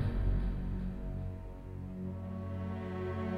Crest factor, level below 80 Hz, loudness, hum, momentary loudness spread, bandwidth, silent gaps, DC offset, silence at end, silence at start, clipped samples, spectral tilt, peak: 14 dB; -40 dBFS; -40 LUFS; none; 9 LU; 5 kHz; none; under 0.1%; 0 s; 0 s; under 0.1%; -9.5 dB/octave; -22 dBFS